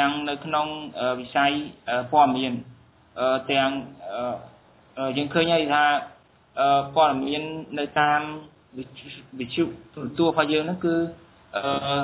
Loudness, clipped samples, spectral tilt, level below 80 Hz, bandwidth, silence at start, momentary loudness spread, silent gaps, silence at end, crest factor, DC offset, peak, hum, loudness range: -24 LUFS; under 0.1%; -9 dB/octave; -60 dBFS; 4 kHz; 0 s; 17 LU; none; 0 s; 18 dB; under 0.1%; -6 dBFS; none; 4 LU